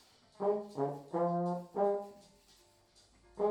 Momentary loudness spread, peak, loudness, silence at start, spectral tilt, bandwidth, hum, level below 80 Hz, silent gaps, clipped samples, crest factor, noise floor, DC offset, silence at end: 6 LU; -20 dBFS; -36 LUFS; 0.4 s; -8.5 dB/octave; 10.5 kHz; none; -74 dBFS; none; under 0.1%; 16 dB; -66 dBFS; under 0.1%; 0 s